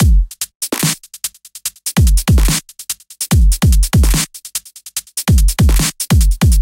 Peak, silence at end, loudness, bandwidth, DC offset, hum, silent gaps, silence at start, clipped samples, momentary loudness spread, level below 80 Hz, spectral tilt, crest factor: -2 dBFS; 0 s; -15 LUFS; 17 kHz; under 0.1%; none; 0.55-0.60 s; 0 s; under 0.1%; 12 LU; -14 dBFS; -4 dB/octave; 10 dB